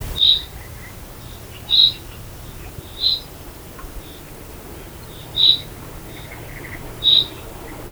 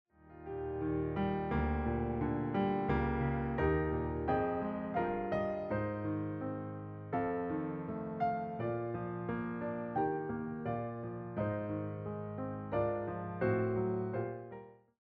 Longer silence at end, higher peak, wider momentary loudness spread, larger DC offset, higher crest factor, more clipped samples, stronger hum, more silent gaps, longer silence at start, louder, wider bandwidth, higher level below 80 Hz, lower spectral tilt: second, 0 s vs 0.3 s; first, 0 dBFS vs -20 dBFS; first, 23 LU vs 8 LU; neither; first, 22 dB vs 16 dB; neither; neither; neither; second, 0 s vs 0.2 s; first, -15 LUFS vs -37 LUFS; first, over 20 kHz vs 5.4 kHz; first, -40 dBFS vs -50 dBFS; second, -2.5 dB/octave vs -7.5 dB/octave